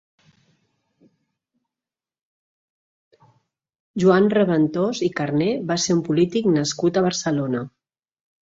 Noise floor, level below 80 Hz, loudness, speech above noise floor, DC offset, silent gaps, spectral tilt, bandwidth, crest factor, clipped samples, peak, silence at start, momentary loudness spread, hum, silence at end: under -90 dBFS; -62 dBFS; -20 LUFS; over 70 dB; under 0.1%; none; -5.5 dB/octave; 8 kHz; 18 dB; under 0.1%; -6 dBFS; 3.95 s; 7 LU; none; 0.75 s